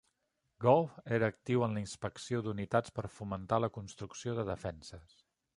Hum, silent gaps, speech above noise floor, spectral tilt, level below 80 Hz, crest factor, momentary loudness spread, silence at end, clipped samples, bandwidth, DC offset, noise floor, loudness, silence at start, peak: none; none; 47 dB; -6.5 dB/octave; -60 dBFS; 22 dB; 14 LU; 0.55 s; under 0.1%; 11.5 kHz; under 0.1%; -82 dBFS; -35 LUFS; 0.6 s; -12 dBFS